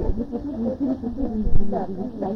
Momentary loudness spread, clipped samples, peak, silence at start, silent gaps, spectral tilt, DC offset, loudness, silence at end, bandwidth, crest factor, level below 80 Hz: 3 LU; under 0.1%; -6 dBFS; 0 s; none; -10.5 dB/octave; under 0.1%; -27 LUFS; 0 s; 1.9 kHz; 14 dB; -28 dBFS